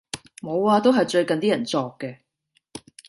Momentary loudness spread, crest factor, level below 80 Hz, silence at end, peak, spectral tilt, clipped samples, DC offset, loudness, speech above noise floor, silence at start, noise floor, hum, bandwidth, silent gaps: 22 LU; 18 dB; -66 dBFS; 0.3 s; -6 dBFS; -5 dB/octave; under 0.1%; under 0.1%; -21 LUFS; 49 dB; 0.15 s; -70 dBFS; none; 11.5 kHz; none